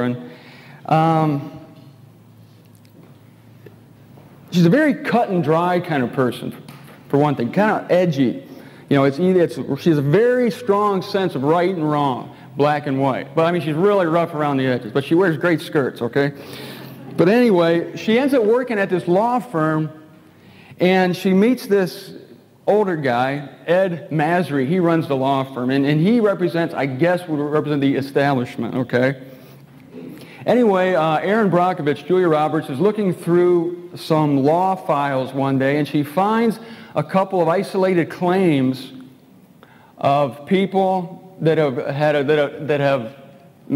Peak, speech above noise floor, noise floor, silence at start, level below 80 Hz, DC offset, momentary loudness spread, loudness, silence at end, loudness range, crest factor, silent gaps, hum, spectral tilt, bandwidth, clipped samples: -2 dBFS; 30 dB; -48 dBFS; 0 s; -68 dBFS; under 0.1%; 9 LU; -18 LUFS; 0 s; 3 LU; 16 dB; none; none; -7.5 dB/octave; 16 kHz; under 0.1%